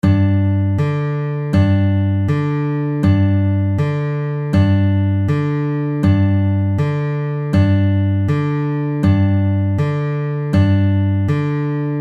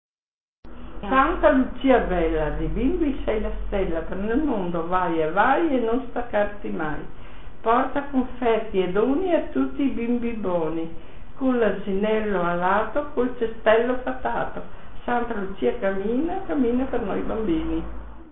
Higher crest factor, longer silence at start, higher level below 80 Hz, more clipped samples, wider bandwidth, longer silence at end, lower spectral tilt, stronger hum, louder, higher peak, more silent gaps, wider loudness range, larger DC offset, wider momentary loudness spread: second, 12 dB vs 18 dB; about the same, 0.05 s vs 0.05 s; about the same, -42 dBFS vs -38 dBFS; neither; first, 4.8 kHz vs 4 kHz; about the same, 0 s vs 0 s; second, -9.5 dB/octave vs -11 dB/octave; neither; first, -17 LUFS vs -24 LUFS; first, -2 dBFS vs -6 dBFS; second, none vs 0.08-0.63 s; second, 0 LU vs 3 LU; second, under 0.1% vs 3%; second, 6 LU vs 10 LU